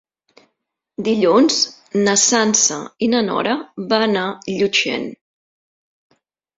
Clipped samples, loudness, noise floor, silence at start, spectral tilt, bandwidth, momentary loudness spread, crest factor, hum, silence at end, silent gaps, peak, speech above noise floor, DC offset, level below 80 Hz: under 0.1%; -17 LUFS; -75 dBFS; 1 s; -2.5 dB/octave; 8 kHz; 11 LU; 18 dB; none; 1.45 s; none; -2 dBFS; 58 dB; under 0.1%; -62 dBFS